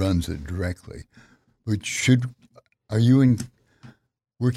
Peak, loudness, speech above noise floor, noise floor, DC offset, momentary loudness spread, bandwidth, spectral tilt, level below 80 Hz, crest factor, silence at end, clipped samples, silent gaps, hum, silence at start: -6 dBFS; -23 LUFS; 41 dB; -62 dBFS; under 0.1%; 20 LU; 13.5 kHz; -6 dB/octave; -46 dBFS; 18 dB; 0 s; under 0.1%; none; none; 0 s